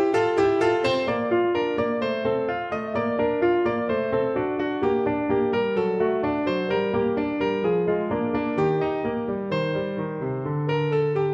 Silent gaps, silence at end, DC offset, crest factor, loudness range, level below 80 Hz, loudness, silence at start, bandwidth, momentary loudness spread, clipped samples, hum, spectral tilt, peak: none; 0 s; under 0.1%; 14 dB; 2 LU; -54 dBFS; -24 LUFS; 0 s; 9 kHz; 6 LU; under 0.1%; none; -7.5 dB/octave; -10 dBFS